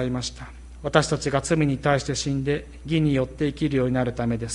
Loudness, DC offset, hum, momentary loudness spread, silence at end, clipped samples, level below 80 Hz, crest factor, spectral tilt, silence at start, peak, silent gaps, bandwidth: -24 LUFS; under 0.1%; none; 8 LU; 0 s; under 0.1%; -42 dBFS; 20 dB; -5.5 dB/octave; 0 s; -4 dBFS; none; 11.5 kHz